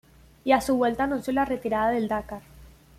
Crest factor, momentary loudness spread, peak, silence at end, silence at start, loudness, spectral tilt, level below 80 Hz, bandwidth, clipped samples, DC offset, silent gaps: 18 dB; 11 LU; -8 dBFS; 0.3 s; 0.45 s; -25 LUFS; -5 dB/octave; -50 dBFS; 15.5 kHz; under 0.1%; under 0.1%; none